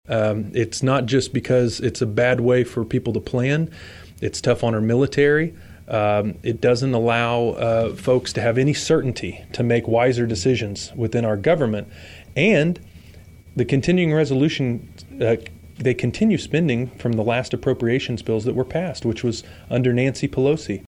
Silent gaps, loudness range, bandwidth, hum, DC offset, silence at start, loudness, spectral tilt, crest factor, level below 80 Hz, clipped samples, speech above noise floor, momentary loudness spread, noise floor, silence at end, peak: none; 2 LU; 12 kHz; none; under 0.1%; 0.1 s; -21 LUFS; -6 dB/octave; 16 dB; -48 dBFS; under 0.1%; 24 dB; 8 LU; -44 dBFS; 0.1 s; -4 dBFS